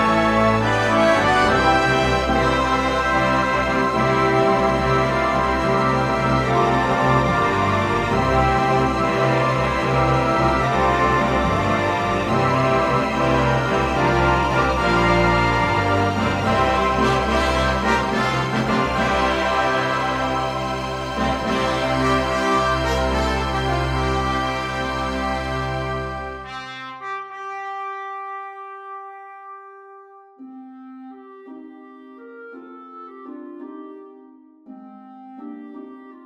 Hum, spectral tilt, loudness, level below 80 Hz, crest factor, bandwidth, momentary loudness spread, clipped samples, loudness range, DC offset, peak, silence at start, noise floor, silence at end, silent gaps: none; -5.5 dB/octave; -19 LUFS; -34 dBFS; 18 dB; 14.5 kHz; 20 LU; under 0.1%; 21 LU; under 0.1%; -2 dBFS; 0 s; -47 dBFS; 0 s; none